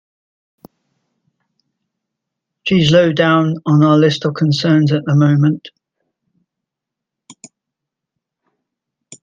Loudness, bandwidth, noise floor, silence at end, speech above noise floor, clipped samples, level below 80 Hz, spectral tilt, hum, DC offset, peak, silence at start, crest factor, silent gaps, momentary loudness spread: -13 LUFS; 9.2 kHz; -82 dBFS; 0.1 s; 70 dB; under 0.1%; -56 dBFS; -7 dB/octave; none; under 0.1%; 0 dBFS; 2.65 s; 16 dB; none; 6 LU